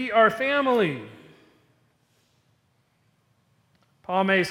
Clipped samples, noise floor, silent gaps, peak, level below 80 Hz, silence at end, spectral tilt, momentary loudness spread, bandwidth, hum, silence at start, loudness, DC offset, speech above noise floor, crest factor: under 0.1%; -68 dBFS; none; -6 dBFS; -72 dBFS; 0 s; -5.5 dB/octave; 21 LU; 17 kHz; none; 0 s; -23 LUFS; under 0.1%; 45 dB; 20 dB